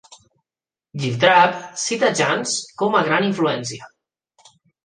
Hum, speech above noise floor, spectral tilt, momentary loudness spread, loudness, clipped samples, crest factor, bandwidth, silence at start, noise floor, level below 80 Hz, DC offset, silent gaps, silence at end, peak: none; over 71 dB; -3.5 dB/octave; 13 LU; -19 LUFS; under 0.1%; 20 dB; 10 kHz; 0.1 s; under -90 dBFS; -66 dBFS; under 0.1%; none; 1 s; 0 dBFS